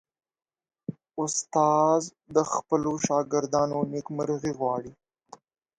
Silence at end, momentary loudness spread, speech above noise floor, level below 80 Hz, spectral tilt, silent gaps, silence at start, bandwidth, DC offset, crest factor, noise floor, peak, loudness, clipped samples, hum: 0.85 s; 14 LU; 27 dB; -66 dBFS; -5 dB/octave; none; 0.9 s; 9.6 kHz; under 0.1%; 20 dB; -53 dBFS; -8 dBFS; -26 LUFS; under 0.1%; none